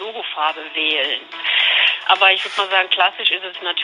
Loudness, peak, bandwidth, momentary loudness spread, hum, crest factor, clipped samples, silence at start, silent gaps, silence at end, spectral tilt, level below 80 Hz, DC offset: -16 LUFS; 0 dBFS; 10.5 kHz; 9 LU; none; 18 dB; under 0.1%; 0 s; none; 0 s; 0 dB/octave; -80 dBFS; under 0.1%